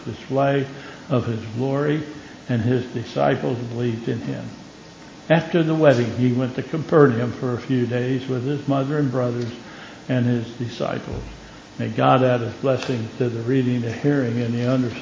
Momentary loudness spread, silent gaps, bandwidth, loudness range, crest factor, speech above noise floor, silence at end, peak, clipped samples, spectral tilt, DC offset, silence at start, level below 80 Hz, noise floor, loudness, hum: 17 LU; none; 7.6 kHz; 5 LU; 20 dB; 21 dB; 0 s; -2 dBFS; under 0.1%; -7.5 dB/octave; under 0.1%; 0 s; -50 dBFS; -42 dBFS; -22 LUFS; none